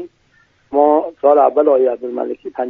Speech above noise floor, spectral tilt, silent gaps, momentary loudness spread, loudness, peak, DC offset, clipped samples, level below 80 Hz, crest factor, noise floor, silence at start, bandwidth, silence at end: 42 dB; -8 dB/octave; none; 11 LU; -15 LUFS; 0 dBFS; under 0.1%; under 0.1%; -62 dBFS; 14 dB; -56 dBFS; 0 s; 3.8 kHz; 0 s